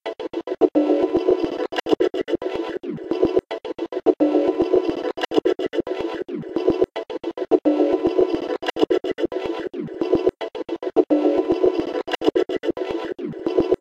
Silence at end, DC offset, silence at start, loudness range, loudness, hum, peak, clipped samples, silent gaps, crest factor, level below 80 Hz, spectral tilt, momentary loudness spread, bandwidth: 0.05 s; under 0.1%; 0.05 s; 1 LU; -22 LUFS; none; -2 dBFS; under 0.1%; none; 18 dB; -52 dBFS; -6.5 dB/octave; 10 LU; 8 kHz